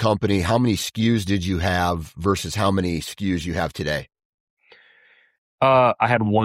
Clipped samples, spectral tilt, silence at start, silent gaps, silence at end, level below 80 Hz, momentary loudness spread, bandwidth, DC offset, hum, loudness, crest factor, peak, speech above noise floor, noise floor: under 0.1%; -5.5 dB/octave; 0 s; 4.25-4.57 s, 5.38-5.58 s; 0 s; -44 dBFS; 9 LU; 16 kHz; under 0.1%; none; -21 LUFS; 16 dB; -6 dBFS; 36 dB; -56 dBFS